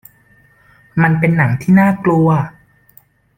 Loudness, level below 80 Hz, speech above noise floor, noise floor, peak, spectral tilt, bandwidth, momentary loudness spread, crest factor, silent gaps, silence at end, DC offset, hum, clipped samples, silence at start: -13 LUFS; -48 dBFS; 39 dB; -51 dBFS; -2 dBFS; -9.5 dB/octave; 16 kHz; 8 LU; 14 dB; none; 0.9 s; under 0.1%; none; under 0.1%; 0.95 s